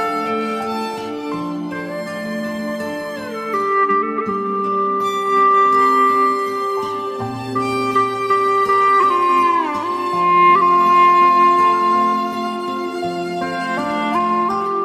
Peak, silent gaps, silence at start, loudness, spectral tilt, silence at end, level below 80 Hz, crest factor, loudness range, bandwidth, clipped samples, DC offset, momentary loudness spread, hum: -2 dBFS; none; 0 s; -17 LUFS; -5 dB/octave; 0 s; -60 dBFS; 14 dB; 8 LU; 15 kHz; under 0.1%; under 0.1%; 13 LU; none